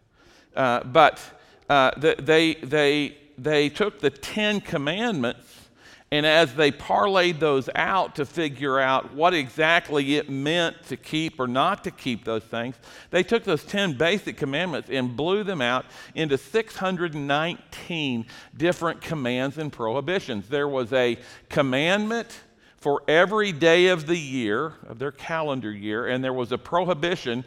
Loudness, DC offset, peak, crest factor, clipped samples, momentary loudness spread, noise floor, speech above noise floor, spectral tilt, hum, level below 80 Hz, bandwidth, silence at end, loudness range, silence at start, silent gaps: -24 LUFS; under 0.1%; -2 dBFS; 22 dB; under 0.1%; 11 LU; -56 dBFS; 32 dB; -5 dB/octave; none; -58 dBFS; 15.5 kHz; 0.05 s; 5 LU; 0.55 s; none